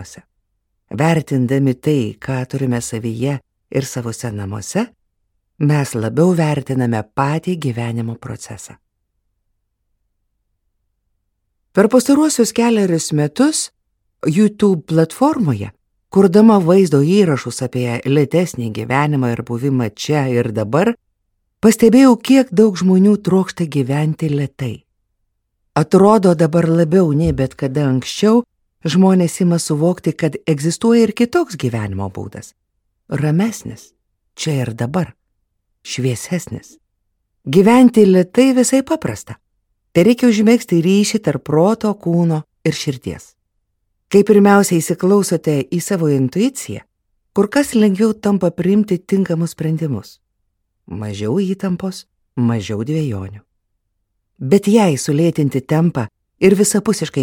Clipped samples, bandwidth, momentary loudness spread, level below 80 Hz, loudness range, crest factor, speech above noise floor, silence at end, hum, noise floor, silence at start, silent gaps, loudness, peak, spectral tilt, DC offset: under 0.1%; 17 kHz; 14 LU; -50 dBFS; 9 LU; 16 dB; 55 dB; 0 s; none; -70 dBFS; 0 s; none; -15 LUFS; 0 dBFS; -6.5 dB/octave; under 0.1%